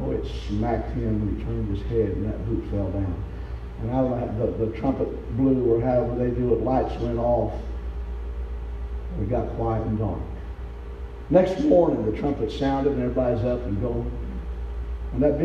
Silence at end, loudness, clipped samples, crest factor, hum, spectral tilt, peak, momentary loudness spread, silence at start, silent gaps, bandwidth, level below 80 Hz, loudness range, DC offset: 0 s; -25 LUFS; under 0.1%; 20 dB; none; -9.5 dB/octave; -4 dBFS; 13 LU; 0 s; none; 7.2 kHz; -32 dBFS; 5 LU; under 0.1%